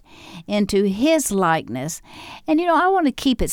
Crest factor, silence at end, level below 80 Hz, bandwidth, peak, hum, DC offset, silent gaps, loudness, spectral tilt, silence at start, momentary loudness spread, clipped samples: 14 dB; 0 s; -38 dBFS; 18.5 kHz; -6 dBFS; none; under 0.1%; none; -19 LUFS; -4.5 dB/octave; 0.2 s; 16 LU; under 0.1%